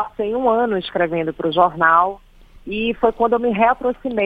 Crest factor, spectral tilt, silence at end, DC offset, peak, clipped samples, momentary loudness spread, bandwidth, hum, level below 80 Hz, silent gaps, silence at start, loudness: 18 dB; -7.5 dB/octave; 0 s; under 0.1%; 0 dBFS; under 0.1%; 8 LU; 4.9 kHz; none; -46 dBFS; none; 0 s; -18 LUFS